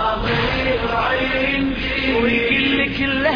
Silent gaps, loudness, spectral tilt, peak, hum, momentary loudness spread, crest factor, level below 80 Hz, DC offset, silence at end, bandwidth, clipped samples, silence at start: none; -18 LUFS; -6.5 dB/octave; -6 dBFS; none; 3 LU; 14 dB; -32 dBFS; under 0.1%; 0 s; 5.2 kHz; under 0.1%; 0 s